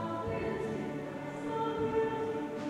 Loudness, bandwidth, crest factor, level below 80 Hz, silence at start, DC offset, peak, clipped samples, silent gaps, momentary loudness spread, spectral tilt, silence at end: -35 LUFS; 12 kHz; 14 dB; -58 dBFS; 0 s; under 0.1%; -20 dBFS; under 0.1%; none; 7 LU; -7 dB/octave; 0 s